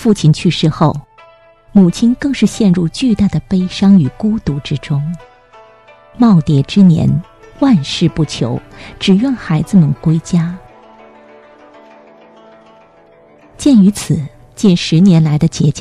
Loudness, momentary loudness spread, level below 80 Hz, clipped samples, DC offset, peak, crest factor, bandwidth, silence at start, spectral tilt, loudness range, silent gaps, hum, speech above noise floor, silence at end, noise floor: -12 LUFS; 10 LU; -40 dBFS; under 0.1%; under 0.1%; 0 dBFS; 12 dB; 12 kHz; 0 s; -7 dB/octave; 5 LU; none; none; 33 dB; 0 s; -44 dBFS